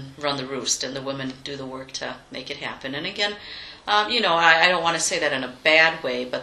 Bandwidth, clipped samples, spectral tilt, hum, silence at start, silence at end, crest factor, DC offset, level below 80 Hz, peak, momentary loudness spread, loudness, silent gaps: 13 kHz; under 0.1%; -1.5 dB/octave; none; 0 s; 0 s; 24 dB; under 0.1%; -58 dBFS; 0 dBFS; 17 LU; -21 LUFS; none